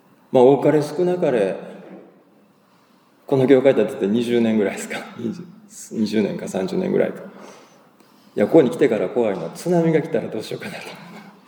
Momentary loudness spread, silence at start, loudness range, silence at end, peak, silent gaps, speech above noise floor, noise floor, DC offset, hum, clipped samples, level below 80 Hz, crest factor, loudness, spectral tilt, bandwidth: 21 LU; 0.3 s; 4 LU; 0.15 s; 0 dBFS; none; 37 dB; -56 dBFS; under 0.1%; none; under 0.1%; -74 dBFS; 20 dB; -19 LUFS; -6.5 dB/octave; over 20 kHz